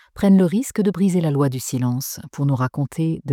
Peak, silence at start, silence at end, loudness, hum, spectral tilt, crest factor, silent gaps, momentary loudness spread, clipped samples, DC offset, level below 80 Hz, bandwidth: -6 dBFS; 0.15 s; 0 s; -20 LUFS; none; -7 dB/octave; 14 dB; none; 8 LU; under 0.1%; under 0.1%; -54 dBFS; 16.5 kHz